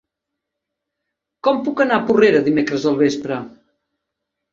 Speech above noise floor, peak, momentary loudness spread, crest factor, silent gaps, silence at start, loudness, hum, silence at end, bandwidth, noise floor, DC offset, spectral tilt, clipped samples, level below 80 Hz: 65 dB; -2 dBFS; 12 LU; 18 dB; none; 1.45 s; -17 LUFS; none; 1.05 s; 7.6 kHz; -81 dBFS; under 0.1%; -6 dB/octave; under 0.1%; -60 dBFS